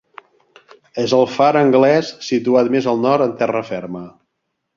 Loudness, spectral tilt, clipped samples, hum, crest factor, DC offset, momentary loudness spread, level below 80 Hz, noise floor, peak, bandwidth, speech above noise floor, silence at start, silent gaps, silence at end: -16 LUFS; -6 dB/octave; under 0.1%; none; 16 dB; under 0.1%; 14 LU; -62 dBFS; -74 dBFS; -2 dBFS; 7.4 kHz; 59 dB; 0.95 s; none; 0.7 s